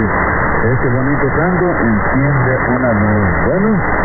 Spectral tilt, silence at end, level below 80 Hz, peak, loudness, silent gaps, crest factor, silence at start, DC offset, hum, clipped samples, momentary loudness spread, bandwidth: -15.5 dB/octave; 0 s; -26 dBFS; -2 dBFS; -13 LUFS; none; 10 dB; 0 s; under 0.1%; none; under 0.1%; 1 LU; 2.3 kHz